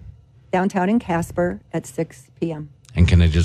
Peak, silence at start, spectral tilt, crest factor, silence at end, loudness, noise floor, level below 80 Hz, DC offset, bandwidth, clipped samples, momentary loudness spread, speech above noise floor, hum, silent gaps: -4 dBFS; 0.05 s; -7 dB/octave; 16 dB; 0 s; -22 LUFS; -44 dBFS; -30 dBFS; under 0.1%; 12.5 kHz; under 0.1%; 13 LU; 25 dB; none; none